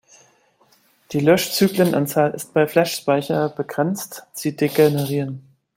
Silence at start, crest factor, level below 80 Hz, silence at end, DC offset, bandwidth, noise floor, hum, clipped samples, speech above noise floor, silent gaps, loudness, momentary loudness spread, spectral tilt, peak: 1.1 s; 18 dB; -62 dBFS; 0.35 s; under 0.1%; 16.5 kHz; -58 dBFS; none; under 0.1%; 39 dB; none; -20 LUFS; 11 LU; -5.5 dB/octave; -2 dBFS